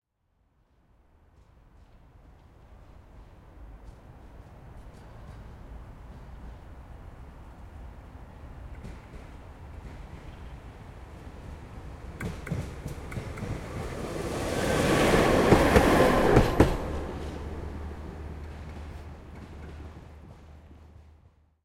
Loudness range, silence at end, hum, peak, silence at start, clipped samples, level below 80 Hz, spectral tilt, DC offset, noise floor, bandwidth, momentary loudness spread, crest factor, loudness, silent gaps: 25 LU; 0.6 s; none; -4 dBFS; 2.25 s; under 0.1%; -40 dBFS; -6 dB/octave; under 0.1%; -71 dBFS; 16.5 kHz; 27 LU; 26 dB; -26 LUFS; none